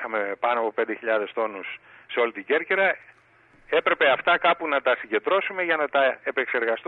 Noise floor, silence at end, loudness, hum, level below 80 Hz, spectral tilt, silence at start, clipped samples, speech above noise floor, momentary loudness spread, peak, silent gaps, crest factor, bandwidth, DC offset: -57 dBFS; 0.05 s; -24 LUFS; none; -70 dBFS; -6 dB/octave; 0 s; under 0.1%; 33 dB; 9 LU; -8 dBFS; none; 16 dB; 4.3 kHz; under 0.1%